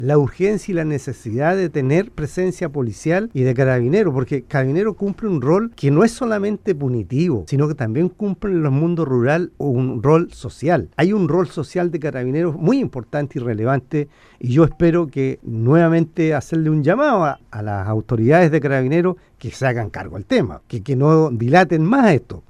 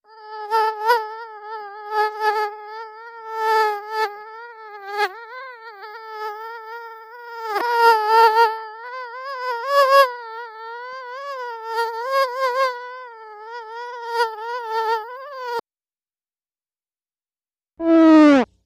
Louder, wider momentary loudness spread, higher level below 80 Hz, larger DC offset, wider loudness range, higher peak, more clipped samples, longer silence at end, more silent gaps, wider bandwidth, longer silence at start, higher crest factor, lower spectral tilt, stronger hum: about the same, -18 LUFS vs -19 LUFS; second, 9 LU vs 22 LU; first, -46 dBFS vs -68 dBFS; neither; second, 3 LU vs 11 LU; about the same, 0 dBFS vs -2 dBFS; neither; about the same, 0.1 s vs 0.2 s; neither; second, 11 kHz vs 15.5 kHz; second, 0 s vs 0.15 s; about the same, 18 dB vs 20 dB; first, -8 dB/octave vs -3 dB/octave; neither